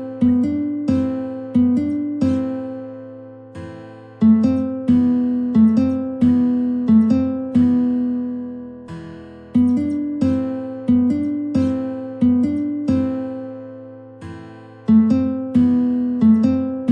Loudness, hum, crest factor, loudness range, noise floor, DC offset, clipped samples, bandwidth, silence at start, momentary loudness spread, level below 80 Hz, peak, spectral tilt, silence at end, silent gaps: -18 LUFS; none; 14 dB; 5 LU; -38 dBFS; under 0.1%; under 0.1%; 5.8 kHz; 0 s; 21 LU; -52 dBFS; -4 dBFS; -9.5 dB/octave; 0 s; none